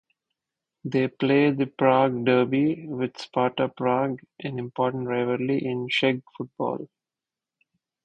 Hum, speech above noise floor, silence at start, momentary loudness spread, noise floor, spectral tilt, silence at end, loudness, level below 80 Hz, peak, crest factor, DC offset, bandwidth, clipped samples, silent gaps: none; 66 dB; 0.85 s; 12 LU; -90 dBFS; -7.5 dB/octave; 1.2 s; -25 LUFS; -68 dBFS; -4 dBFS; 20 dB; under 0.1%; 8.6 kHz; under 0.1%; none